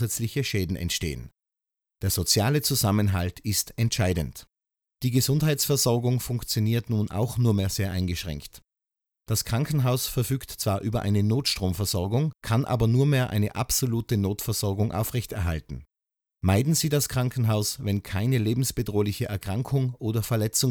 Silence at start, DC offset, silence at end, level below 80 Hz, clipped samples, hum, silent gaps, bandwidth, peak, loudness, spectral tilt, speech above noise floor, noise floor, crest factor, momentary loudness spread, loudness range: 0 s; under 0.1%; 0 s; -46 dBFS; under 0.1%; none; none; over 20 kHz; -8 dBFS; -26 LUFS; -5 dB/octave; 59 dB; -84 dBFS; 18 dB; 7 LU; 3 LU